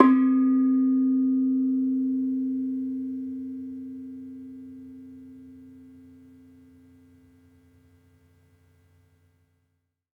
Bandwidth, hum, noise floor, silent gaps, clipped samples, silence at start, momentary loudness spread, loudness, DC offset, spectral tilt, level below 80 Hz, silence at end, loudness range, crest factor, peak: 3.5 kHz; none; -76 dBFS; none; under 0.1%; 0 s; 24 LU; -25 LUFS; under 0.1%; -8.5 dB/octave; -76 dBFS; 4.35 s; 24 LU; 26 dB; -2 dBFS